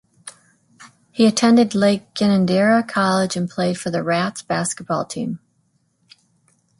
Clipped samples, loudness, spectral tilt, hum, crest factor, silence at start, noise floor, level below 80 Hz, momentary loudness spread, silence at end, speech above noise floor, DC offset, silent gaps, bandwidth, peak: under 0.1%; -19 LUFS; -5 dB/octave; none; 18 dB; 0.25 s; -65 dBFS; -62 dBFS; 15 LU; 1.45 s; 47 dB; under 0.1%; none; 11.5 kHz; -2 dBFS